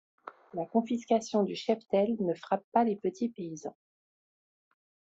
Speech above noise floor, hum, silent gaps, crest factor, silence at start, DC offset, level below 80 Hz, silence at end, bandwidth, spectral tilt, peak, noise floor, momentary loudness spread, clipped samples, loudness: over 60 dB; none; 2.64-2.72 s; 20 dB; 0.25 s; under 0.1%; -76 dBFS; 1.45 s; 8 kHz; -6 dB/octave; -12 dBFS; under -90 dBFS; 14 LU; under 0.1%; -31 LUFS